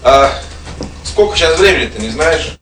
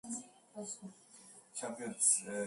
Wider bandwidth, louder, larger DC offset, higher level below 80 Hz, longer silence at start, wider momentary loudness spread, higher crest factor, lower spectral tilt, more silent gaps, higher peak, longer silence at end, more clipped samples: about the same, 13 kHz vs 12 kHz; first, -11 LUFS vs -35 LUFS; neither; first, -26 dBFS vs -84 dBFS; about the same, 0 s vs 0.05 s; second, 18 LU vs 24 LU; second, 12 dB vs 24 dB; first, -3.5 dB/octave vs -2 dB/octave; neither; first, 0 dBFS vs -16 dBFS; about the same, 0.05 s vs 0 s; first, 0.6% vs under 0.1%